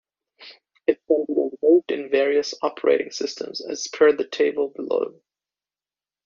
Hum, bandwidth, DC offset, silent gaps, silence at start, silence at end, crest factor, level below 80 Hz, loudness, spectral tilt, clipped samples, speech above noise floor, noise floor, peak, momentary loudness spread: 50 Hz at -75 dBFS; 7.4 kHz; under 0.1%; none; 0.4 s; 1.15 s; 18 dB; -72 dBFS; -22 LUFS; -1.5 dB/octave; under 0.1%; over 68 dB; under -90 dBFS; -4 dBFS; 10 LU